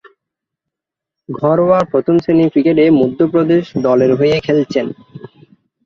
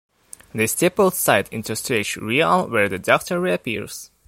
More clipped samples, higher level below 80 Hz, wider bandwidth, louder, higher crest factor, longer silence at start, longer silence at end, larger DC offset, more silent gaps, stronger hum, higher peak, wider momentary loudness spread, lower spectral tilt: neither; about the same, -52 dBFS vs -56 dBFS; second, 7 kHz vs 16.5 kHz; first, -13 LUFS vs -20 LUFS; second, 12 dB vs 20 dB; first, 1.3 s vs 0.55 s; first, 0.6 s vs 0.2 s; neither; neither; neither; about the same, -2 dBFS vs 0 dBFS; about the same, 8 LU vs 9 LU; first, -8 dB/octave vs -4 dB/octave